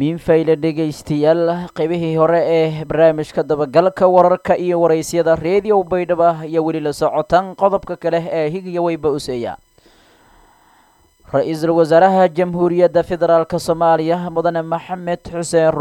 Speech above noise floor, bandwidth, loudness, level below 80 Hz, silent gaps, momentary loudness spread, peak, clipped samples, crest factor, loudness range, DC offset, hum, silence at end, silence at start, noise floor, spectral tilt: 38 dB; 17 kHz; -16 LUFS; -48 dBFS; none; 8 LU; 0 dBFS; under 0.1%; 16 dB; 6 LU; under 0.1%; none; 0 s; 0 s; -53 dBFS; -6.5 dB/octave